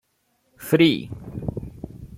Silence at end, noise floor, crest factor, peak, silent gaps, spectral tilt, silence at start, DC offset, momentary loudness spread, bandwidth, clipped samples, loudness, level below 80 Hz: 0 s; -69 dBFS; 20 dB; -4 dBFS; none; -6 dB/octave; 0.6 s; under 0.1%; 21 LU; 16.5 kHz; under 0.1%; -22 LUFS; -48 dBFS